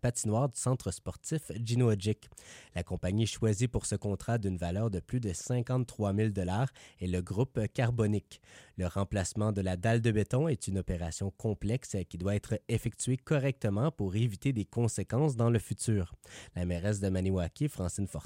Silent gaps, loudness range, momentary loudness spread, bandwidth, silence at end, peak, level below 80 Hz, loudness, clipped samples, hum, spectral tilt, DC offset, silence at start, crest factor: none; 2 LU; 8 LU; 16 kHz; 0 s; -16 dBFS; -52 dBFS; -33 LUFS; under 0.1%; none; -6 dB/octave; under 0.1%; 0.05 s; 16 dB